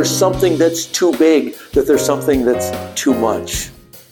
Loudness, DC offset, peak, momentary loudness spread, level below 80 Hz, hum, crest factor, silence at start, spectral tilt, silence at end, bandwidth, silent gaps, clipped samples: -15 LUFS; under 0.1%; -2 dBFS; 8 LU; -38 dBFS; none; 14 dB; 0 s; -4 dB/octave; 0.1 s; 19 kHz; none; under 0.1%